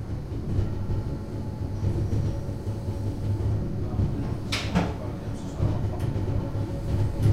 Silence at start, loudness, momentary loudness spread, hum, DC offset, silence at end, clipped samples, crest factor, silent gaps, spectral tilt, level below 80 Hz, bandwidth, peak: 0 s; -29 LUFS; 6 LU; none; under 0.1%; 0 s; under 0.1%; 16 dB; none; -7 dB/octave; -34 dBFS; 12.5 kHz; -10 dBFS